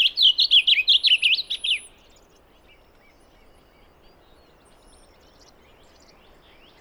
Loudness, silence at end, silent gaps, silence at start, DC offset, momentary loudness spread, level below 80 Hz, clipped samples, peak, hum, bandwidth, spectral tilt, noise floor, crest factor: -16 LUFS; 5 s; none; 0 s; under 0.1%; 9 LU; -58 dBFS; under 0.1%; -6 dBFS; none; over 20 kHz; 1.5 dB/octave; -55 dBFS; 18 dB